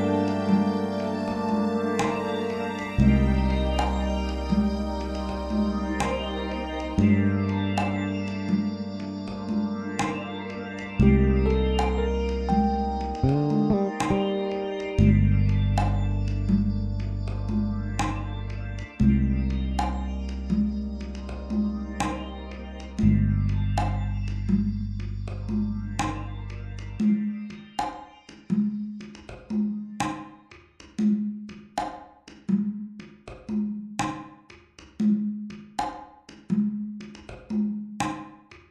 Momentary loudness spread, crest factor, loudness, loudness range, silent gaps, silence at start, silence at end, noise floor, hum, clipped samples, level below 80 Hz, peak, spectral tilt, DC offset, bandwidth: 14 LU; 20 dB; -27 LUFS; 7 LU; none; 0 s; 0.15 s; -51 dBFS; none; under 0.1%; -34 dBFS; -6 dBFS; -7.5 dB/octave; under 0.1%; 10 kHz